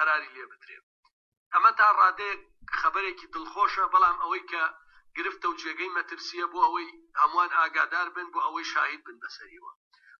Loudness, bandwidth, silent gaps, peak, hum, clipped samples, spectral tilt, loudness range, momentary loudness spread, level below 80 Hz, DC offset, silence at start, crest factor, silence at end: -26 LUFS; 7 kHz; 0.83-1.03 s, 1.13-1.51 s; -8 dBFS; none; under 0.1%; -1.5 dB/octave; 4 LU; 17 LU; -70 dBFS; under 0.1%; 0 s; 20 dB; 0.5 s